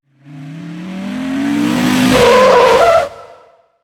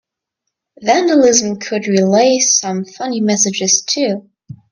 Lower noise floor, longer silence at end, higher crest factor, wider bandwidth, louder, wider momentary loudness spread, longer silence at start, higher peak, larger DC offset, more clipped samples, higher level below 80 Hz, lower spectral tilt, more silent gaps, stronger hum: second, -45 dBFS vs -77 dBFS; first, 0.6 s vs 0.15 s; about the same, 12 dB vs 16 dB; first, 18.5 kHz vs 10.5 kHz; first, -10 LUFS vs -13 LUFS; first, 20 LU vs 11 LU; second, 0.3 s vs 0.8 s; about the same, 0 dBFS vs 0 dBFS; neither; neither; first, -40 dBFS vs -60 dBFS; first, -4.5 dB/octave vs -3 dB/octave; neither; neither